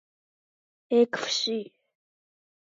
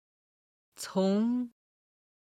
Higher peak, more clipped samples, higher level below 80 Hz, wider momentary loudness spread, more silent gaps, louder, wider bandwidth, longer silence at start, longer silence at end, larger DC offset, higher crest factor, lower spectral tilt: first, -10 dBFS vs -18 dBFS; neither; second, -88 dBFS vs -78 dBFS; second, 11 LU vs 14 LU; neither; first, -26 LUFS vs -30 LUFS; second, 7.6 kHz vs 15 kHz; about the same, 0.9 s vs 0.8 s; first, 1.05 s vs 0.8 s; neither; about the same, 20 dB vs 16 dB; second, -2.5 dB/octave vs -6.5 dB/octave